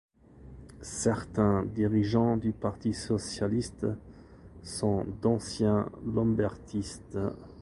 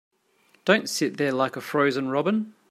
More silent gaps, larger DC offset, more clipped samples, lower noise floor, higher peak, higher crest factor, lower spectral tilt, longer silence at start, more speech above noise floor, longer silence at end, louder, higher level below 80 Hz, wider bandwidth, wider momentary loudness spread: neither; neither; neither; second, -51 dBFS vs -63 dBFS; second, -12 dBFS vs -4 dBFS; about the same, 18 dB vs 22 dB; first, -6.5 dB/octave vs -4.5 dB/octave; second, 0.35 s vs 0.65 s; second, 22 dB vs 39 dB; second, 0 s vs 0.2 s; second, -30 LUFS vs -24 LUFS; first, -50 dBFS vs -74 dBFS; second, 11.5 kHz vs 16 kHz; first, 12 LU vs 5 LU